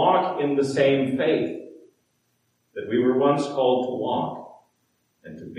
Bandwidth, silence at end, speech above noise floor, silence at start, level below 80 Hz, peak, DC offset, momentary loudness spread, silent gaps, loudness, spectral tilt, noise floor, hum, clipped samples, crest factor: 11.5 kHz; 0 s; 48 dB; 0 s; -74 dBFS; -6 dBFS; under 0.1%; 18 LU; none; -23 LUFS; -6.5 dB/octave; -70 dBFS; none; under 0.1%; 18 dB